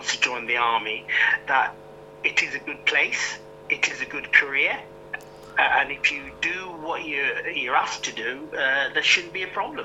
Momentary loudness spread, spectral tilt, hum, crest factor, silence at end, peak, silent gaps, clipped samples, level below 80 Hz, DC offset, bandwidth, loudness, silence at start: 11 LU; -1 dB/octave; none; 24 dB; 0 s; 0 dBFS; none; under 0.1%; -60 dBFS; under 0.1%; 16 kHz; -23 LUFS; 0 s